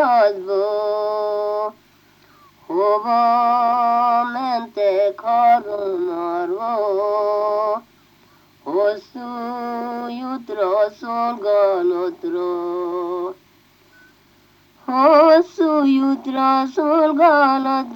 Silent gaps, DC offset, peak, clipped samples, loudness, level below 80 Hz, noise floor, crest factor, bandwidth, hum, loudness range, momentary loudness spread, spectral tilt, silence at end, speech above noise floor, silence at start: none; under 0.1%; -2 dBFS; under 0.1%; -18 LUFS; -70 dBFS; -54 dBFS; 18 dB; 17 kHz; 50 Hz at -65 dBFS; 7 LU; 13 LU; -5.5 dB/octave; 0 s; 36 dB; 0 s